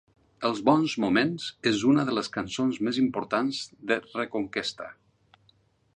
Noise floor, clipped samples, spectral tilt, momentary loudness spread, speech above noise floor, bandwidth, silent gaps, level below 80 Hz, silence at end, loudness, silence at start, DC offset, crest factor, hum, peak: -65 dBFS; under 0.1%; -5 dB/octave; 9 LU; 39 dB; 10 kHz; none; -64 dBFS; 1.05 s; -27 LUFS; 0.4 s; under 0.1%; 20 dB; none; -6 dBFS